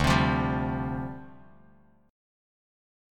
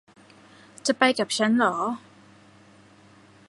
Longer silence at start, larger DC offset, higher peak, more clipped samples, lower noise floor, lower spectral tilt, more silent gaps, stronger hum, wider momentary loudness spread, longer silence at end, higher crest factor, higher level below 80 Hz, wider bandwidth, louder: second, 0 s vs 0.85 s; neither; second, -8 dBFS vs -4 dBFS; neither; first, -60 dBFS vs -53 dBFS; first, -6 dB/octave vs -3 dB/octave; neither; neither; first, 15 LU vs 9 LU; second, 1 s vs 1.5 s; about the same, 22 dB vs 24 dB; first, -42 dBFS vs -74 dBFS; first, 16.5 kHz vs 11.5 kHz; second, -28 LUFS vs -23 LUFS